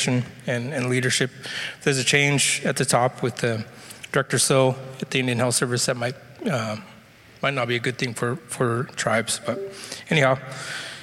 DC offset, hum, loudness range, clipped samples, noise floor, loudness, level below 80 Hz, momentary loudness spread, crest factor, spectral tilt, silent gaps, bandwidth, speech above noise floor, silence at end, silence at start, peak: under 0.1%; none; 4 LU; under 0.1%; -49 dBFS; -23 LUFS; -62 dBFS; 13 LU; 18 dB; -3.5 dB/octave; none; 16 kHz; 25 dB; 0 s; 0 s; -6 dBFS